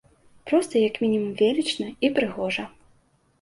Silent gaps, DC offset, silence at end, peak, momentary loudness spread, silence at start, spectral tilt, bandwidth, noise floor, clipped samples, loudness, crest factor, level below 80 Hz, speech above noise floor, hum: none; under 0.1%; 0.75 s; -6 dBFS; 7 LU; 0.45 s; -5 dB/octave; 11.5 kHz; -63 dBFS; under 0.1%; -24 LUFS; 18 dB; -62 dBFS; 40 dB; none